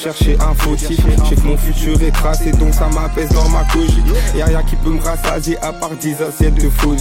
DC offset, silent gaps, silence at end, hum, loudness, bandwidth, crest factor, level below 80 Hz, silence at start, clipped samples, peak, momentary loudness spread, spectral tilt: under 0.1%; none; 0 s; none; -16 LUFS; 16.5 kHz; 12 dB; -14 dBFS; 0 s; under 0.1%; 0 dBFS; 5 LU; -5.5 dB/octave